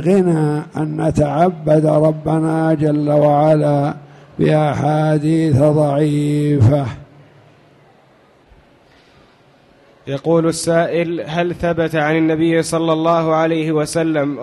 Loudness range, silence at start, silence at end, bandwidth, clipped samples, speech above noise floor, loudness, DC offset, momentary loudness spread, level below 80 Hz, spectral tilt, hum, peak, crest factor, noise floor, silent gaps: 7 LU; 0 s; 0 s; 12 kHz; under 0.1%; 35 dB; -16 LUFS; under 0.1%; 7 LU; -44 dBFS; -7 dB/octave; none; -2 dBFS; 12 dB; -50 dBFS; none